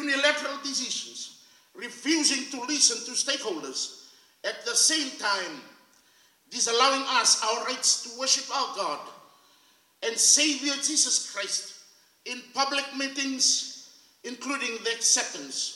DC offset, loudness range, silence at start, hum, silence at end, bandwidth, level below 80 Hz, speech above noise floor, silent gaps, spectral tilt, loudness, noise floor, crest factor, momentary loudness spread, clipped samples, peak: under 0.1%; 3 LU; 0 s; none; 0 s; 16.5 kHz; under -90 dBFS; 35 dB; none; 1.5 dB/octave; -24 LUFS; -62 dBFS; 22 dB; 17 LU; under 0.1%; -6 dBFS